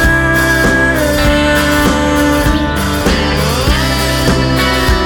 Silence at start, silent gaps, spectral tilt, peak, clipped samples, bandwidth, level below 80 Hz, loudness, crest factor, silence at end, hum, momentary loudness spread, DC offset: 0 s; none; -4.5 dB/octave; 0 dBFS; under 0.1%; over 20 kHz; -18 dBFS; -11 LUFS; 12 dB; 0 s; none; 3 LU; under 0.1%